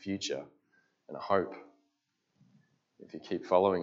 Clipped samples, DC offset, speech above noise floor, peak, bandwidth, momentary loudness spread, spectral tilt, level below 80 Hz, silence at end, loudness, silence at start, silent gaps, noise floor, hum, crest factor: under 0.1%; under 0.1%; 48 dB; -12 dBFS; 7.8 kHz; 22 LU; -5 dB/octave; -82 dBFS; 0 s; -33 LUFS; 0 s; none; -80 dBFS; none; 24 dB